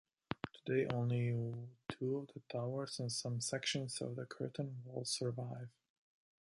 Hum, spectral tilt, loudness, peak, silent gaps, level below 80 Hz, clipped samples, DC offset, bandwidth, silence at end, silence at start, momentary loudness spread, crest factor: none; -5 dB/octave; -41 LUFS; -18 dBFS; none; -74 dBFS; under 0.1%; under 0.1%; 11.5 kHz; 0.75 s; 0.3 s; 10 LU; 22 dB